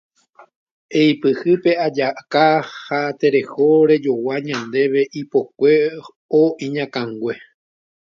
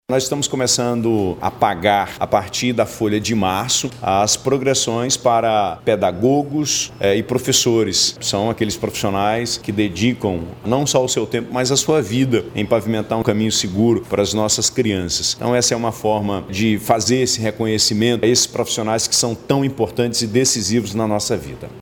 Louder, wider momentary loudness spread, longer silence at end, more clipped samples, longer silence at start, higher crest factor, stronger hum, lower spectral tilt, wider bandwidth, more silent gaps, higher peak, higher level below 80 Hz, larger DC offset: about the same, -18 LUFS vs -18 LUFS; first, 9 LU vs 5 LU; first, 0.8 s vs 0 s; neither; first, 0.9 s vs 0.1 s; about the same, 16 dB vs 18 dB; neither; first, -6.5 dB/octave vs -3.5 dB/octave; second, 7.2 kHz vs 19 kHz; first, 6.16-6.29 s vs none; about the same, -2 dBFS vs 0 dBFS; second, -68 dBFS vs -48 dBFS; neither